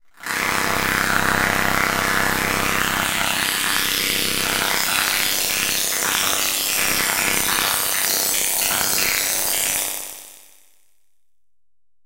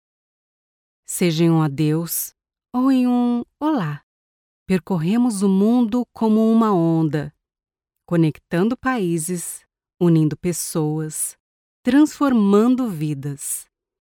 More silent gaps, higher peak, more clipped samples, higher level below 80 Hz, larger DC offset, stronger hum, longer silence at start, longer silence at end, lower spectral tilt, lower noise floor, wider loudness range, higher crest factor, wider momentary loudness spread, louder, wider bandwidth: second, none vs 4.03-4.66 s, 11.40-11.84 s; about the same, -2 dBFS vs -4 dBFS; neither; first, -48 dBFS vs -58 dBFS; neither; neither; second, 0.2 s vs 1.1 s; first, 1.65 s vs 0.35 s; second, -0.5 dB/octave vs -6 dB/octave; second, -86 dBFS vs under -90 dBFS; about the same, 2 LU vs 3 LU; about the same, 20 dB vs 16 dB; second, 2 LU vs 11 LU; about the same, -18 LUFS vs -20 LUFS; second, 16 kHz vs 18.5 kHz